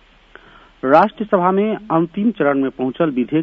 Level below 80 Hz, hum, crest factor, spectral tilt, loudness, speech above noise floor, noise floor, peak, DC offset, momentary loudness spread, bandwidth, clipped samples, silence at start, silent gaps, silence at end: -54 dBFS; none; 18 dB; -9 dB/octave; -17 LUFS; 30 dB; -46 dBFS; 0 dBFS; under 0.1%; 6 LU; 6.2 kHz; under 0.1%; 0.85 s; none; 0 s